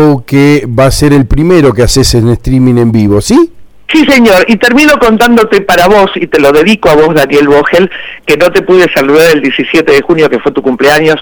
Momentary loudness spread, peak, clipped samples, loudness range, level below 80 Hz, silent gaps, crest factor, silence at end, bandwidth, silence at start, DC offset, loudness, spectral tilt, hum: 4 LU; 0 dBFS; 2%; 2 LU; -24 dBFS; none; 6 dB; 0 s; over 20 kHz; 0 s; under 0.1%; -6 LUFS; -5.5 dB/octave; none